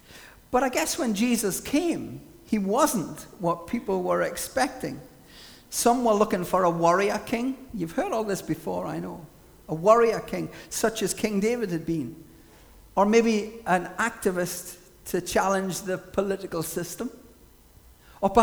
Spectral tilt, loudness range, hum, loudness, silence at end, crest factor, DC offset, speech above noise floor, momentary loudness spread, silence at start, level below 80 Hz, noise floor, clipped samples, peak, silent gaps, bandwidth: -4.5 dB/octave; 3 LU; none; -26 LUFS; 0 s; 22 dB; under 0.1%; 28 dB; 14 LU; 0.1 s; -54 dBFS; -54 dBFS; under 0.1%; -4 dBFS; none; over 20 kHz